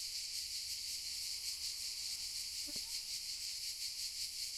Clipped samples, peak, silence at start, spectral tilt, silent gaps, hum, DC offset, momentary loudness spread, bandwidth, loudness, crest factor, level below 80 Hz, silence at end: under 0.1%; -28 dBFS; 0 s; 2 dB/octave; none; none; under 0.1%; 1 LU; 16.5 kHz; -40 LUFS; 16 dB; -70 dBFS; 0 s